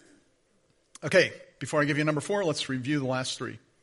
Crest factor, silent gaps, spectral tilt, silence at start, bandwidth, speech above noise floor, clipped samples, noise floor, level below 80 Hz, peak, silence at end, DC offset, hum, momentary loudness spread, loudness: 22 dB; none; -4.5 dB/octave; 1 s; 11.5 kHz; 40 dB; under 0.1%; -68 dBFS; -68 dBFS; -8 dBFS; 0.25 s; under 0.1%; none; 13 LU; -27 LUFS